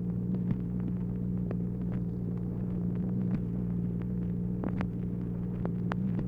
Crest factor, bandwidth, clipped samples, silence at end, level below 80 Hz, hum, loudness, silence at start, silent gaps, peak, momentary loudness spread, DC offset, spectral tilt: 20 dB; 3.6 kHz; under 0.1%; 0 s; -46 dBFS; 60 Hz at -45 dBFS; -33 LUFS; 0 s; none; -12 dBFS; 3 LU; under 0.1%; -11 dB/octave